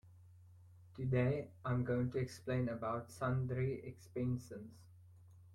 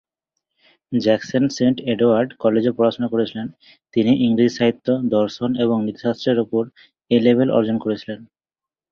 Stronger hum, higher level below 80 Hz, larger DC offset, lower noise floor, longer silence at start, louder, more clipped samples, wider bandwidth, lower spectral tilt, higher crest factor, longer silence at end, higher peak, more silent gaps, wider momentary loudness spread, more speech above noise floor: neither; second, -64 dBFS vs -58 dBFS; neither; second, -61 dBFS vs under -90 dBFS; second, 0.05 s vs 0.9 s; second, -40 LUFS vs -19 LUFS; neither; first, 12 kHz vs 7 kHz; about the same, -8 dB/octave vs -7 dB/octave; about the same, 16 dB vs 18 dB; second, 0 s vs 0.7 s; second, -24 dBFS vs -2 dBFS; neither; first, 12 LU vs 9 LU; second, 22 dB vs over 71 dB